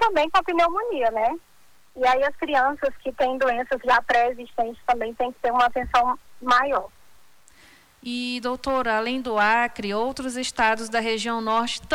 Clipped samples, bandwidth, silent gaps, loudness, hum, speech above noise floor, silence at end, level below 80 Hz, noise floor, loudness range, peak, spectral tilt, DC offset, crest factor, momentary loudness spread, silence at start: under 0.1%; 19 kHz; none; -23 LUFS; none; 35 dB; 0 s; -50 dBFS; -58 dBFS; 3 LU; -8 dBFS; -3 dB/octave; under 0.1%; 14 dB; 8 LU; 0 s